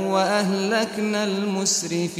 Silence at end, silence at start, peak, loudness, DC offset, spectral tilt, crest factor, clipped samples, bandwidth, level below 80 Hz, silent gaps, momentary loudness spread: 0 s; 0 s; -8 dBFS; -22 LUFS; under 0.1%; -3.5 dB/octave; 14 dB; under 0.1%; 16 kHz; -68 dBFS; none; 3 LU